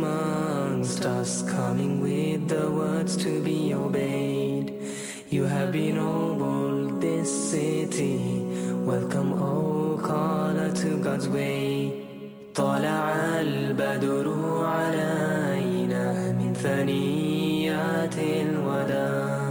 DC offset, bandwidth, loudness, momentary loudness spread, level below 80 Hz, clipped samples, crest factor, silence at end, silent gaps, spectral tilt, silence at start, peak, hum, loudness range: under 0.1%; 17 kHz; -26 LUFS; 3 LU; -62 dBFS; under 0.1%; 12 dB; 0 s; none; -6 dB/octave; 0 s; -12 dBFS; none; 1 LU